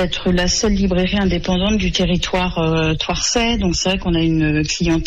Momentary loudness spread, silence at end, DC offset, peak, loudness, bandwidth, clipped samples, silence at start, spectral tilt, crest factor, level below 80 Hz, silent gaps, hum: 2 LU; 0 s; under 0.1%; -6 dBFS; -17 LUFS; 8.4 kHz; under 0.1%; 0 s; -4.5 dB/octave; 10 dB; -28 dBFS; none; none